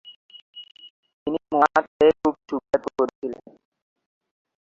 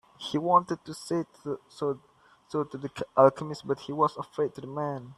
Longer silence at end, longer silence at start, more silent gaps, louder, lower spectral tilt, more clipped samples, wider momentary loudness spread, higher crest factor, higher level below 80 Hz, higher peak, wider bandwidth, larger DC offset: first, 1.35 s vs 0.05 s; second, 0.05 s vs 0.2 s; first, 0.16-0.29 s, 0.42-0.53 s, 0.90-1.03 s, 1.13-1.26 s, 1.88-2.00 s, 3.15-3.22 s vs none; first, -23 LUFS vs -29 LUFS; about the same, -5.5 dB/octave vs -6.5 dB/octave; neither; first, 24 LU vs 14 LU; about the same, 24 dB vs 24 dB; first, -60 dBFS vs -68 dBFS; first, -2 dBFS vs -6 dBFS; second, 7.6 kHz vs 12.5 kHz; neither